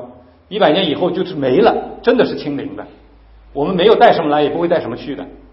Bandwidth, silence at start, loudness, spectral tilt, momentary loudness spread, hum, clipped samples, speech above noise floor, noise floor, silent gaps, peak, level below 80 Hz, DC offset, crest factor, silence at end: 5.8 kHz; 0 s; -15 LUFS; -8.5 dB/octave; 17 LU; none; under 0.1%; 29 dB; -44 dBFS; none; 0 dBFS; -46 dBFS; under 0.1%; 16 dB; 0.15 s